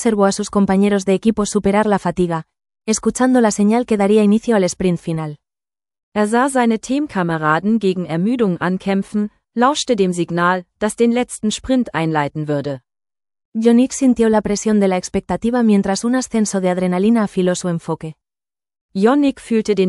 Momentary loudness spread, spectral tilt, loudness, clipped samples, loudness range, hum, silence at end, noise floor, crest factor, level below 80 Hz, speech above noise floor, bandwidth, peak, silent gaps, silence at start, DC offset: 8 LU; -5.5 dB/octave; -17 LUFS; under 0.1%; 3 LU; none; 0 s; under -90 dBFS; 16 dB; -48 dBFS; over 74 dB; 12 kHz; 0 dBFS; 6.03-6.12 s, 13.45-13.52 s, 18.81-18.89 s; 0 s; under 0.1%